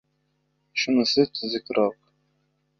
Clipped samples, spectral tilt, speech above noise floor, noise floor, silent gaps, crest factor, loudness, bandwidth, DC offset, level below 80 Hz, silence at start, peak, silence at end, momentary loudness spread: under 0.1%; -4 dB/octave; 49 dB; -72 dBFS; none; 20 dB; -24 LUFS; 7.2 kHz; under 0.1%; -66 dBFS; 0.75 s; -6 dBFS; 0.9 s; 8 LU